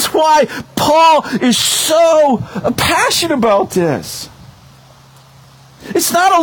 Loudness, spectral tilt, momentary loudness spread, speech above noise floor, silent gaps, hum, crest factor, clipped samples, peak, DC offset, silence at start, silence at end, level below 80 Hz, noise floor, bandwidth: -12 LUFS; -3 dB/octave; 10 LU; 30 dB; none; none; 14 dB; under 0.1%; 0 dBFS; under 0.1%; 0 s; 0 s; -46 dBFS; -42 dBFS; over 20 kHz